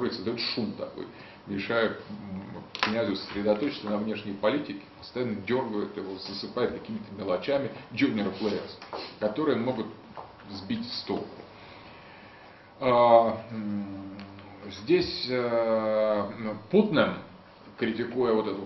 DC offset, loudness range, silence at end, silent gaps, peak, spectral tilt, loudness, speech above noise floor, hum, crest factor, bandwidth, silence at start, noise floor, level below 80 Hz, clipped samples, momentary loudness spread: under 0.1%; 6 LU; 0 s; none; -4 dBFS; -7 dB/octave; -29 LUFS; 22 dB; none; 24 dB; 6.2 kHz; 0 s; -51 dBFS; -62 dBFS; under 0.1%; 18 LU